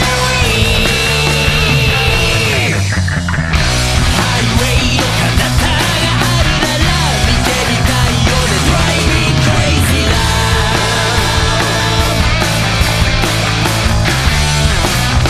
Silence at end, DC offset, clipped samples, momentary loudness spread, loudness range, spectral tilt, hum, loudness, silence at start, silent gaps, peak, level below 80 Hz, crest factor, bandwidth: 0 s; 0.4%; under 0.1%; 2 LU; 1 LU; -4 dB/octave; none; -12 LUFS; 0 s; none; 0 dBFS; -18 dBFS; 12 dB; 14 kHz